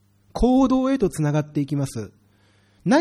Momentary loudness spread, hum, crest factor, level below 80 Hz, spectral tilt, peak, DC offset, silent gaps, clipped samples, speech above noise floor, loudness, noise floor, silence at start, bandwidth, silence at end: 16 LU; none; 14 dB; -38 dBFS; -7 dB/octave; -6 dBFS; under 0.1%; none; under 0.1%; 38 dB; -22 LUFS; -59 dBFS; 0.35 s; 13 kHz; 0 s